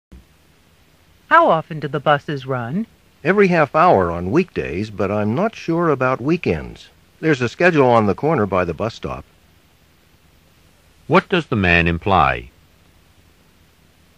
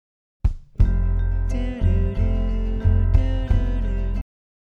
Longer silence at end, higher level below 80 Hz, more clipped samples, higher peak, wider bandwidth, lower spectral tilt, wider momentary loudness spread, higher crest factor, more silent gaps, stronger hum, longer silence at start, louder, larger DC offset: first, 1.7 s vs 0.55 s; second, -44 dBFS vs -22 dBFS; neither; first, 0 dBFS vs -4 dBFS; first, 11 kHz vs 3.8 kHz; second, -7 dB/octave vs -9 dB/octave; first, 12 LU vs 7 LU; about the same, 18 dB vs 16 dB; neither; neither; second, 0.1 s vs 0.45 s; first, -17 LUFS vs -24 LUFS; neither